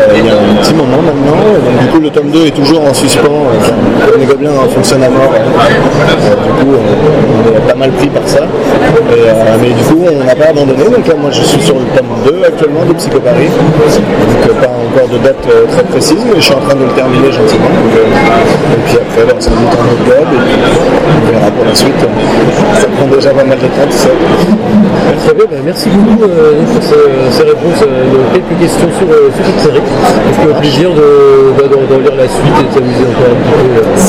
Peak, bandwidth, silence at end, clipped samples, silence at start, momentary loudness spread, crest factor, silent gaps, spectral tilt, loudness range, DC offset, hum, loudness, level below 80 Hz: 0 dBFS; 16 kHz; 0 s; 0.4%; 0 s; 3 LU; 6 dB; none; -6 dB/octave; 1 LU; under 0.1%; none; -7 LUFS; -28 dBFS